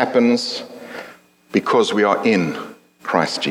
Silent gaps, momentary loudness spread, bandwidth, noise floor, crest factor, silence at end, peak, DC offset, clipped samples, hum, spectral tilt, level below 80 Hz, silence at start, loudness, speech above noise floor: none; 18 LU; 14.5 kHz; -44 dBFS; 18 dB; 0 s; -2 dBFS; under 0.1%; under 0.1%; none; -4.5 dB/octave; -70 dBFS; 0 s; -18 LUFS; 27 dB